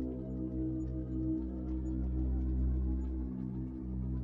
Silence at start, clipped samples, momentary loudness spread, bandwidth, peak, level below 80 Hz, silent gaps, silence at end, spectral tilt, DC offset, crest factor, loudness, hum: 0 s; under 0.1%; 5 LU; 2 kHz; -26 dBFS; -38 dBFS; none; 0 s; -12 dB/octave; under 0.1%; 10 dB; -37 LUFS; none